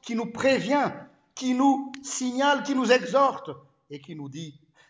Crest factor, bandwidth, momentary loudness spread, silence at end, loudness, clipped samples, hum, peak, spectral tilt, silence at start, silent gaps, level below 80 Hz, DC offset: 20 dB; 8 kHz; 21 LU; 0.4 s; -24 LUFS; under 0.1%; none; -6 dBFS; -4 dB/octave; 0.05 s; none; -70 dBFS; under 0.1%